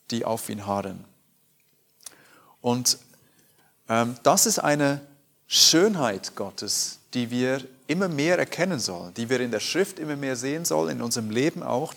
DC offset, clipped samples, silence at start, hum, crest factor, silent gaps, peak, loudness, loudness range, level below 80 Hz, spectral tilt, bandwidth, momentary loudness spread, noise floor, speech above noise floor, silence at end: under 0.1%; under 0.1%; 0.1 s; none; 26 dB; none; 0 dBFS; -24 LUFS; 8 LU; -72 dBFS; -3 dB/octave; 19 kHz; 12 LU; -65 dBFS; 40 dB; 0 s